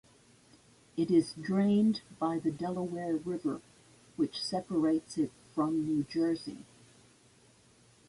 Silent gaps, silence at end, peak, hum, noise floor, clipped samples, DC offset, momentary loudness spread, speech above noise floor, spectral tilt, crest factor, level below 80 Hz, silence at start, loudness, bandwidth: none; 1.45 s; -16 dBFS; none; -63 dBFS; under 0.1%; under 0.1%; 9 LU; 32 dB; -6.5 dB/octave; 18 dB; -70 dBFS; 0.95 s; -32 LUFS; 11.5 kHz